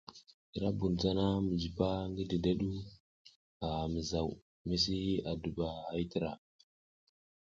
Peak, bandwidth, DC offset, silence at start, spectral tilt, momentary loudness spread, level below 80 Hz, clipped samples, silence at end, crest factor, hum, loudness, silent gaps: -16 dBFS; 7.6 kHz; under 0.1%; 0.1 s; -6.5 dB/octave; 11 LU; -52 dBFS; under 0.1%; 1.05 s; 20 dB; none; -36 LUFS; 0.34-0.53 s, 3.00-3.25 s, 3.36-3.60 s, 4.42-4.65 s